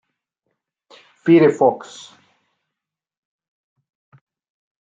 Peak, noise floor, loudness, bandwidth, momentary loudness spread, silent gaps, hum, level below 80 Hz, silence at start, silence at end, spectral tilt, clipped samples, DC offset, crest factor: -2 dBFS; -85 dBFS; -15 LUFS; 7.8 kHz; 25 LU; none; none; -72 dBFS; 1.25 s; 3.05 s; -7 dB/octave; under 0.1%; under 0.1%; 20 dB